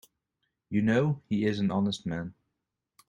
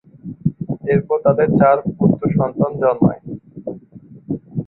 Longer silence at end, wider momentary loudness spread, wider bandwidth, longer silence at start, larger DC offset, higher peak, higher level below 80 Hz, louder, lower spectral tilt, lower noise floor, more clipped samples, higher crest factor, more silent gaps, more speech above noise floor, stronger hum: first, 0.75 s vs 0.05 s; second, 10 LU vs 18 LU; first, 10 kHz vs 4.1 kHz; first, 0.7 s vs 0.25 s; neither; second, -14 dBFS vs -2 dBFS; second, -64 dBFS vs -48 dBFS; second, -29 LUFS vs -17 LUFS; second, -7 dB/octave vs -13.5 dB/octave; first, -85 dBFS vs -42 dBFS; neither; about the same, 18 dB vs 16 dB; neither; first, 57 dB vs 26 dB; neither